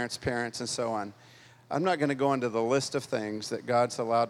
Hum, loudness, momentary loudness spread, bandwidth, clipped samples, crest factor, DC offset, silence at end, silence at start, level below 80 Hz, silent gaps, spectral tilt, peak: none; -30 LUFS; 8 LU; 14.5 kHz; under 0.1%; 16 dB; under 0.1%; 0 s; 0 s; -64 dBFS; none; -4.5 dB/octave; -14 dBFS